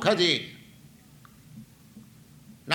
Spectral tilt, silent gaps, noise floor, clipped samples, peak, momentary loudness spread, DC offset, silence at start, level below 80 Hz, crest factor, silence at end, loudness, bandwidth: -4 dB/octave; none; -53 dBFS; under 0.1%; -6 dBFS; 28 LU; under 0.1%; 0 s; -66 dBFS; 24 dB; 0 s; -24 LUFS; 19.5 kHz